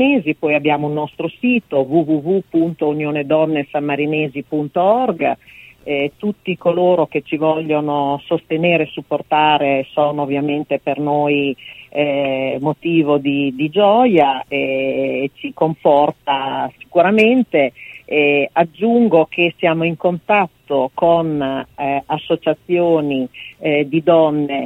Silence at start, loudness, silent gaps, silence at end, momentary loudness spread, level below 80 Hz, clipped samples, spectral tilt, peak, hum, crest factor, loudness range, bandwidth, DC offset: 0 s; -17 LUFS; none; 0 s; 8 LU; -58 dBFS; under 0.1%; -8 dB/octave; 0 dBFS; none; 16 dB; 3 LU; 4.8 kHz; under 0.1%